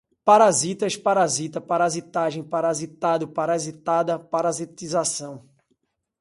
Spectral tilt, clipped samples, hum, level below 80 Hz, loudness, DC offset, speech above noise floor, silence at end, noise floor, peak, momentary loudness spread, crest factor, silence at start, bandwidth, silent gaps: -4 dB/octave; under 0.1%; none; -68 dBFS; -22 LUFS; under 0.1%; 49 dB; 0.8 s; -72 dBFS; -4 dBFS; 9 LU; 20 dB; 0.25 s; 11.5 kHz; none